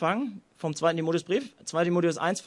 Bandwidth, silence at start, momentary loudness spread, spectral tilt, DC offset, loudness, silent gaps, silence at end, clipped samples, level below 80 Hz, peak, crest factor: 11.5 kHz; 0 s; 9 LU; -5.5 dB/octave; under 0.1%; -28 LUFS; none; 0.05 s; under 0.1%; -76 dBFS; -10 dBFS; 16 dB